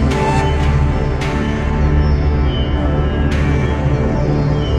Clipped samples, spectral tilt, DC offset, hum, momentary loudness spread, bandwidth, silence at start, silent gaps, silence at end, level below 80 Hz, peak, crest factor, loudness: under 0.1%; -7.5 dB/octave; 0.4%; none; 3 LU; 9.2 kHz; 0 s; none; 0 s; -18 dBFS; -2 dBFS; 12 dB; -16 LUFS